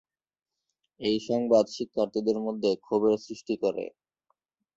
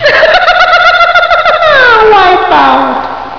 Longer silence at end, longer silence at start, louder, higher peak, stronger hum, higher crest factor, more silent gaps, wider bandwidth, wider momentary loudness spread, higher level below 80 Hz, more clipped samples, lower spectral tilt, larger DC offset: first, 0.85 s vs 0 s; first, 1 s vs 0 s; second, -28 LUFS vs -4 LUFS; second, -10 dBFS vs 0 dBFS; neither; first, 18 dB vs 6 dB; neither; first, 7.8 kHz vs 5.4 kHz; first, 9 LU vs 4 LU; second, -68 dBFS vs -34 dBFS; second, under 0.1% vs 5%; first, -5.5 dB/octave vs -3.5 dB/octave; second, under 0.1% vs 2%